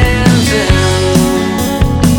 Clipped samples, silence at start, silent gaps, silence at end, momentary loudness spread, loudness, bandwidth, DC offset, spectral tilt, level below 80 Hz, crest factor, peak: under 0.1%; 0 s; none; 0 s; 4 LU; -11 LUFS; 19.5 kHz; under 0.1%; -5 dB/octave; -18 dBFS; 10 dB; 0 dBFS